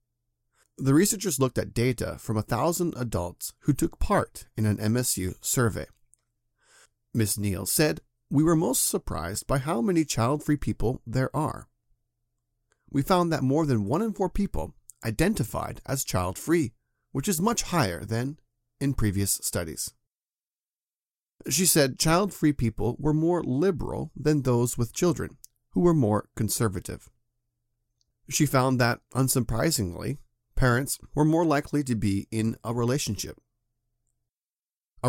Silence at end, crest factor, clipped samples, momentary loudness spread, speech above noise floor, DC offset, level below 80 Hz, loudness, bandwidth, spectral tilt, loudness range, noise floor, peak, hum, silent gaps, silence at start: 0 s; 20 dB; under 0.1%; 11 LU; over 64 dB; under 0.1%; -44 dBFS; -26 LUFS; 17 kHz; -5 dB/octave; 4 LU; under -90 dBFS; -8 dBFS; none; 20.52-20.56 s, 21.11-21.15 s, 34.59-34.63 s; 0.8 s